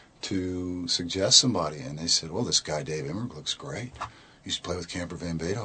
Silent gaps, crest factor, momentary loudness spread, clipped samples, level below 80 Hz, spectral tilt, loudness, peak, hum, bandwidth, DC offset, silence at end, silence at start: none; 26 dB; 17 LU; under 0.1%; -54 dBFS; -3 dB/octave; -26 LUFS; -2 dBFS; none; 9.2 kHz; under 0.1%; 0 s; 0.25 s